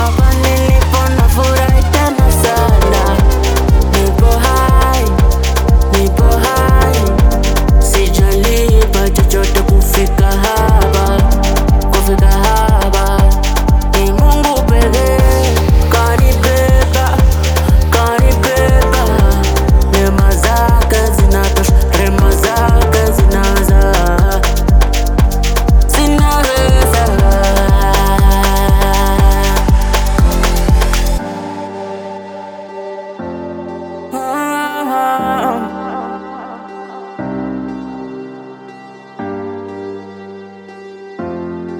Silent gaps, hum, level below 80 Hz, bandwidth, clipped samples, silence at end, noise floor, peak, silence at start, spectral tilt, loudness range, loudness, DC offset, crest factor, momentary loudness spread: none; none; -12 dBFS; over 20 kHz; under 0.1%; 0 s; -34 dBFS; 0 dBFS; 0 s; -5.5 dB/octave; 12 LU; -12 LUFS; under 0.1%; 10 dB; 15 LU